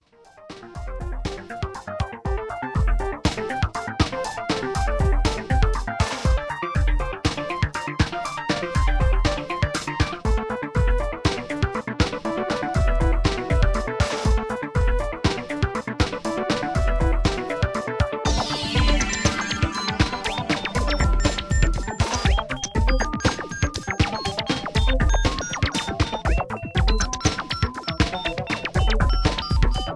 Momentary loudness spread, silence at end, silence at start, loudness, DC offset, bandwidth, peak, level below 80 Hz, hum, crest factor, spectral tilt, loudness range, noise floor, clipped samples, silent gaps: 5 LU; 0 s; 0.4 s; -24 LUFS; 0.1%; 11 kHz; -6 dBFS; -26 dBFS; none; 18 dB; -5 dB/octave; 2 LU; -48 dBFS; under 0.1%; none